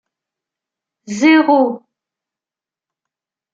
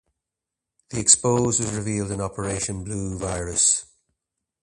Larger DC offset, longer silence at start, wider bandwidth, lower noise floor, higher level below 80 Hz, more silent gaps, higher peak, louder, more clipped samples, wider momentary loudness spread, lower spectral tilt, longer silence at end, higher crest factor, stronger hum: neither; first, 1.1 s vs 0.9 s; second, 7.8 kHz vs 11.5 kHz; about the same, -89 dBFS vs -86 dBFS; second, -68 dBFS vs -46 dBFS; neither; about the same, -2 dBFS vs 0 dBFS; first, -13 LUFS vs -21 LUFS; neither; first, 18 LU vs 12 LU; about the same, -4.5 dB/octave vs -3.5 dB/octave; first, 1.75 s vs 0.8 s; second, 18 dB vs 24 dB; neither